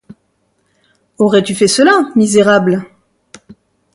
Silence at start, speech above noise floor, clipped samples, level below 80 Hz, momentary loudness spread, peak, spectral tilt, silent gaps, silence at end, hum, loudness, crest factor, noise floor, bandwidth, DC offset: 1.2 s; 51 dB; under 0.1%; -58 dBFS; 7 LU; 0 dBFS; -4.5 dB/octave; none; 1.1 s; none; -11 LUFS; 14 dB; -61 dBFS; 11.5 kHz; under 0.1%